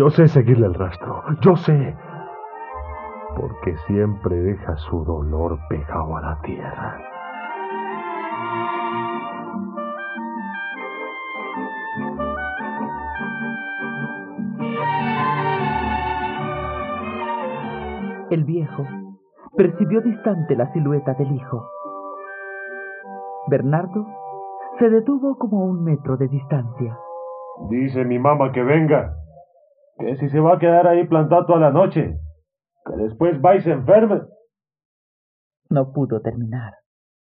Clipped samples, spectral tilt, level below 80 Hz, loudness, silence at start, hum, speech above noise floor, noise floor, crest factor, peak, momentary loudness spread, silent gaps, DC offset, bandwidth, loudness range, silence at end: under 0.1%; -7.5 dB/octave; -42 dBFS; -21 LUFS; 0 s; none; 46 dB; -64 dBFS; 20 dB; -2 dBFS; 17 LU; 34.85-35.51 s; under 0.1%; 5.4 kHz; 10 LU; 0.5 s